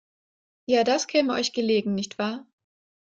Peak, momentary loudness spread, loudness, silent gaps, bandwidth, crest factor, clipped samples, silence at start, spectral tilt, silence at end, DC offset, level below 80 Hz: -8 dBFS; 9 LU; -24 LUFS; none; 9 kHz; 18 dB; under 0.1%; 0.7 s; -4 dB/octave; 0.6 s; under 0.1%; -70 dBFS